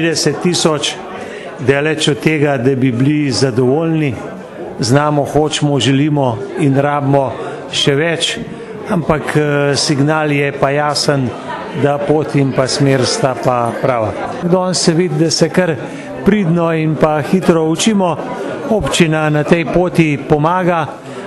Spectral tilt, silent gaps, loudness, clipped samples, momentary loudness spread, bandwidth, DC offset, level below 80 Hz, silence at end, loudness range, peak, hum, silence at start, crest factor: -5 dB/octave; none; -14 LUFS; under 0.1%; 8 LU; 12.5 kHz; under 0.1%; -42 dBFS; 0 s; 1 LU; 0 dBFS; none; 0 s; 14 dB